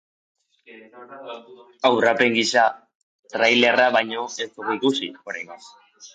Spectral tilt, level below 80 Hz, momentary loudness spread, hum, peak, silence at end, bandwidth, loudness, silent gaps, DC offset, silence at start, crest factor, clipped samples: -3 dB/octave; -74 dBFS; 21 LU; none; -4 dBFS; 0.05 s; 9.4 kHz; -20 LUFS; 2.95-3.23 s; under 0.1%; 0.7 s; 20 dB; under 0.1%